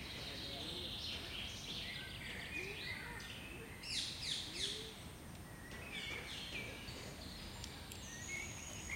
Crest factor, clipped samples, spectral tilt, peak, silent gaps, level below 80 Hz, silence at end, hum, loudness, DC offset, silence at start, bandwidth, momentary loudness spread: 20 dB; under 0.1%; -2.5 dB/octave; -26 dBFS; none; -60 dBFS; 0 s; none; -45 LUFS; under 0.1%; 0 s; 16 kHz; 9 LU